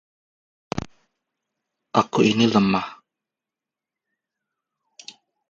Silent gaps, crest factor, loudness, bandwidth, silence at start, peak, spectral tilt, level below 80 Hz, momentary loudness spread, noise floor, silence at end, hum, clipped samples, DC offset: none; 24 dB; -21 LUFS; 7.6 kHz; 0.75 s; -2 dBFS; -5.5 dB/octave; -56 dBFS; 24 LU; -88 dBFS; 2.55 s; none; under 0.1%; under 0.1%